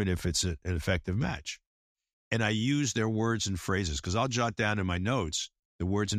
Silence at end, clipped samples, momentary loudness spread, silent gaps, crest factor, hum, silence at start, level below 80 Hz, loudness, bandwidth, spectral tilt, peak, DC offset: 0 s; under 0.1%; 6 LU; 1.67-1.96 s, 2.13-2.31 s, 5.59-5.79 s; 18 dB; none; 0 s; -46 dBFS; -30 LUFS; 15.5 kHz; -4.5 dB/octave; -12 dBFS; under 0.1%